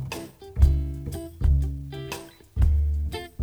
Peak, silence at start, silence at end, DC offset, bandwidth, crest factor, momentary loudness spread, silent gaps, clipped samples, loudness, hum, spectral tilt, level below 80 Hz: -6 dBFS; 0 s; 0 s; under 0.1%; 14.5 kHz; 20 dB; 14 LU; none; under 0.1%; -26 LUFS; none; -6.5 dB/octave; -26 dBFS